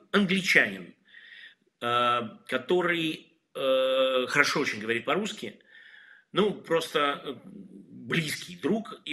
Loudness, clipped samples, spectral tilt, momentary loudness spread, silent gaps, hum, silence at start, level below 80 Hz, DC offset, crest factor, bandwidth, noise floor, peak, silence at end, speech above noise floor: -27 LUFS; under 0.1%; -4 dB/octave; 19 LU; none; none; 0.15 s; -74 dBFS; under 0.1%; 24 dB; 14 kHz; -54 dBFS; -4 dBFS; 0 s; 26 dB